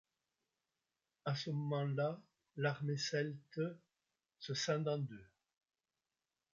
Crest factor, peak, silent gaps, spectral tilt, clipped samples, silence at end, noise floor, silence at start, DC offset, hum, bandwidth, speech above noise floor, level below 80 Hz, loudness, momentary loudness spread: 20 dB; -22 dBFS; none; -5 dB/octave; under 0.1%; 1.3 s; under -90 dBFS; 1.25 s; under 0.1%; none; 7.6 kHz; over 50 dB; -82 dBFS; -40 LUFS; 15 LU